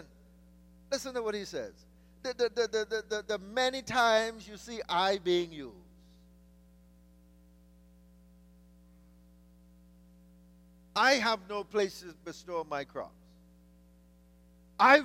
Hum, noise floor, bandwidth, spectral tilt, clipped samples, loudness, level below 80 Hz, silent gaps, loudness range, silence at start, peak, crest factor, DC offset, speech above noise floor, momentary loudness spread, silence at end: 60 Hz at -60 dBFS; -60 dBFS; 16 kHz; -3 dB/octave; under 0.1%; -31 LUFS; -62 dBFS; none; 8 LU; 0 s; -8 dBFS; 26 dB; under 0.1%; 28 dB; 20 LU; 0 s